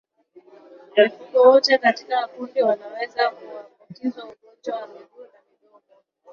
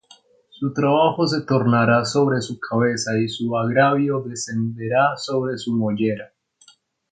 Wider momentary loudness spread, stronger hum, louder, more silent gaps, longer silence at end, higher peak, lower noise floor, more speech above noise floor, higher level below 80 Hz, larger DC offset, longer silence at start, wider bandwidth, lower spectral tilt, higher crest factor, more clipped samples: first, 25 LU vs 8 LU; neither; about the same, -20 LUFS vs -20 LUFS; neither; first, 1.1 s vs 0.85 s; about the same, -2 dBFS vs -2 dBFS; first, -61 dBFS vs -55 dBFS; first, 41 dB vs 35 dB; second, -72 dBFS vs -60 dBFS; neither; first, 0.95 s vs 0.6 s; second, 7 kHz vs 9.4 kHz; second, -3.5 dB/octave vs -5.5 dB/octave; about the same, 20 dB vs 18 dB; neither